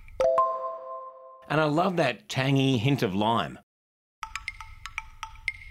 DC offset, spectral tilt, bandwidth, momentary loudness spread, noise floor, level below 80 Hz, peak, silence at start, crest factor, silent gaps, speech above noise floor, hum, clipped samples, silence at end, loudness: under 0.1%; -6 dB/octave; 15 kHz; 16 LU; -45 dBFS; -54 dBFS; -10 dBFS; 0 s; 18 dB; 3.63-4.22 s; 20 dB; none; under 0.1%; 0 s; -27 LUFS